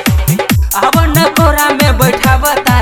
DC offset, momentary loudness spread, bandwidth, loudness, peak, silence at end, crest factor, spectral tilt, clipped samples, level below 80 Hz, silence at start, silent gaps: under 0.1%; 3 LU; 16 kHz; -10 LUFS; 0 dBFS; 0 s; 10 dB; -4.5 dB/octave; 0.7%; -16 dBFS; 0 s; none